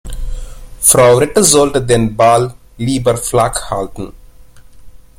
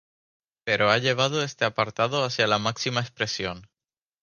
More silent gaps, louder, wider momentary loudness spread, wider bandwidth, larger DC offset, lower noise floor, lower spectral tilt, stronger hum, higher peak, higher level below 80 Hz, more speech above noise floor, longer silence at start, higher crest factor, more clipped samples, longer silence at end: neither; first, -11 LUFS vs -24 LUFS; first, 20 LU vs 9 LU; first, 17 kHz vs 10 kHz; neither; second, -37 dBFS vs under -90 dBFS; about the same, -4 dB/octave vs -4 dB/octave; neither; first, 0 dBFS vs -4 dBFS; first, -30 dBFS vs -60 dBFS; second, 26 dB vs over 65 dB; second, 0.05 s vs 0.65 s; second, 14 dB vs 22 dB; first, 0.1% vs under 0.1%; second, 0.2 s vs 0.6 s